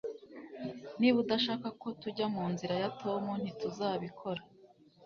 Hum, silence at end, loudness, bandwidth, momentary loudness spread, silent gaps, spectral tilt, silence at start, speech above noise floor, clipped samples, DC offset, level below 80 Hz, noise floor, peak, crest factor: none; 0 s; -35 LUFS; 6.8 kHz; 14 LU; none; -4 dB/octave; 0.05 s; 27 dB; under 0.1%; under 0.1%; -74 dBFS; -61 dBFS; -16 dBFS; 20 dB